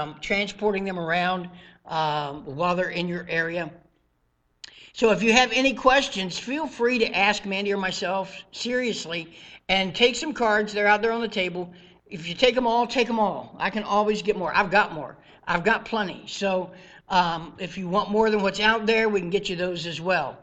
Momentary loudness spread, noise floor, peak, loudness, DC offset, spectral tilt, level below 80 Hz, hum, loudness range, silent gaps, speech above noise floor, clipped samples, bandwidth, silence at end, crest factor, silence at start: 13 LU; -69 dBFS; -2 dBFS; -24 LUFS; under 0.1%; -4 dB/octave; -54 dBFS; none; 5 LU; none; 45 dB; under 0.1%; 9 kHz; 0.05 s; 22 dB; 0 s